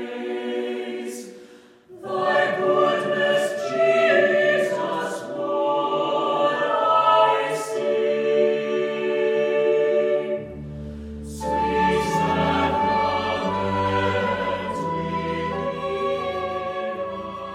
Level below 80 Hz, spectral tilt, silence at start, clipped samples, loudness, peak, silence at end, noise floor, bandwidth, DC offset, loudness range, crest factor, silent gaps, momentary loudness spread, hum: -48 dBFS; -5 dB/octave; 0 s; under 0.1%; -22 LUFS; -6 dBFS; 0 s; -48 dBFS; 14.5 kHz; under 0.1%; 4 LU; 16 dB; none; 12 LU; none